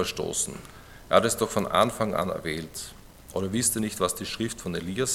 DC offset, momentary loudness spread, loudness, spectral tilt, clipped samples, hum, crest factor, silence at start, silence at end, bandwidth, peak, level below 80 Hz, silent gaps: under 0.1%; 13 LU; -27 LUFS; -3.5 dB/octave; under 0.1%; none; 24 dB; 0 s; 0 s; 17.5 kHz; -4 dBFS; -52 dBFS; none